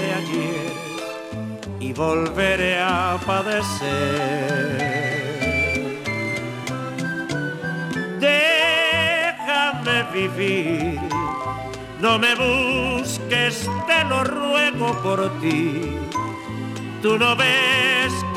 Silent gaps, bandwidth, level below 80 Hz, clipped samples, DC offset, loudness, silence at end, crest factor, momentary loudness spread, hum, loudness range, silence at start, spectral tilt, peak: none; 16.5 kHz; -46 dBFS; under 0.1%; under 0.1%; -21 LUFS; 0 s; 16 dB; 12 LU; none; 4 LU; 0 s; -4 dB/octave; -6 dBFS